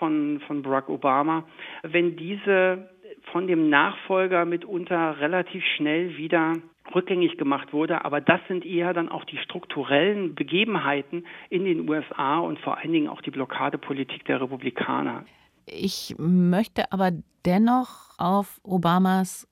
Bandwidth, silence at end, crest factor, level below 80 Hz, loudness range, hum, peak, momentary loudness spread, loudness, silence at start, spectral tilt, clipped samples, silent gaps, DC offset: 15.5 kHz; 0.1 s; 22 dB; -64 dBFS; 4 LU; none; -2 dBFS; 10 LU; -25 LUFS; 0 s; -6 dB/octave; under 0.1%; none; under 0.1%